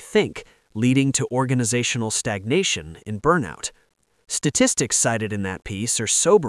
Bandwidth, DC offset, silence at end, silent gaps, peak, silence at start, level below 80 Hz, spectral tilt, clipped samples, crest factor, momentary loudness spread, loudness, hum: 12 kHz; under 0.1%; 0 s; none; -4 dBFS; 0 s; -52 dBFS; -3.5 dB/octave; under 0.1%; 18 dB; 11 LU; -21 LUFS; none